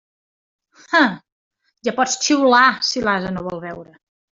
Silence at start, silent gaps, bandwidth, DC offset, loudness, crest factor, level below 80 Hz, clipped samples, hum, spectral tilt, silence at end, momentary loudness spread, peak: 0.9 s; 1.32-1.51 s; 7.8 kHz; under 0.1%; -17 LUFS; 18 dB; -56 dBFS; under 0.1%; none; -3 dB/octave; 0.55 s; 18 LU; -2 dBFS